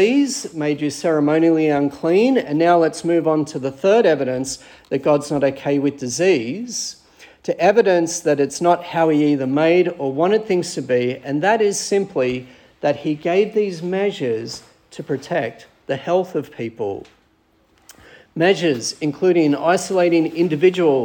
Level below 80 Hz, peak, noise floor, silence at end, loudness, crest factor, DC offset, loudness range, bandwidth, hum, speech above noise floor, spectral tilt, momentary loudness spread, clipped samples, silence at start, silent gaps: -62 dBFS; -2 dBFS; -59 dBFS; 0 s; -19 LUFS; 16 dB; under 0.1%; 7 LU; 17.5 kHz; none; 41 dB; -5 dB/octave; 11 LU; under 0.1%; 0 s; none